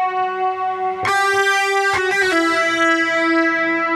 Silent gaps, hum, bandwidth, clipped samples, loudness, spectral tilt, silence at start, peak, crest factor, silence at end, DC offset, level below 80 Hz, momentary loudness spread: none; none; 14.5 kHz; under 0.1%; -16 LUFS; -2.5 dB/octave; 0 s; -4 dBFS; 12 dB; 0 s; under 0.1%; -58 dBFS; 6 LU